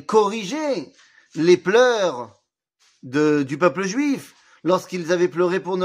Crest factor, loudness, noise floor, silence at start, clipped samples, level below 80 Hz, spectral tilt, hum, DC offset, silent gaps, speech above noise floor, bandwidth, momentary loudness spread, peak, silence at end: 18 dB; -20 LUFS; -65 dBFS; 0.1 s; under 0.1%; -74 dBFS; -5 dB/octave; none; under 0.1%; none; 46 dB; 15 kHz; 12 LU; -4 dBFS; 0 s